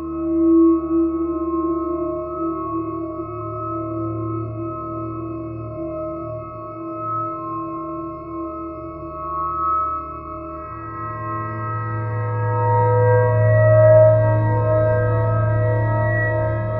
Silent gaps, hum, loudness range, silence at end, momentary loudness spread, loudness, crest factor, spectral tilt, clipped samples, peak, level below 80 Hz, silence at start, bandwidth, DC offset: none; none; 12 LU; 0 s; 15 LU; -20 LUFS; 18 dB; -14 dB/octave; under 0.1%; -2 dBFS; -40 dBFS; 0 s; 2.7 kHz; under 0.1%